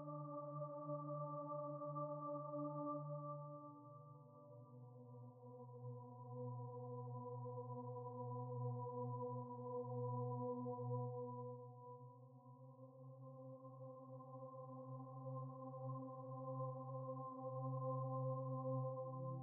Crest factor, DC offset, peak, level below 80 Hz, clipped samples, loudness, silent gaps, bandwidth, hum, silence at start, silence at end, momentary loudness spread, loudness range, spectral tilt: 16 dB; under 0.1%; -34 dBFS; under -90 dBFS; under 0.1%; -50 LUFS; none; 1.5 kHz; none; 0 s; 0 s; 14 LU; 9 LU; -3.5 dB/octave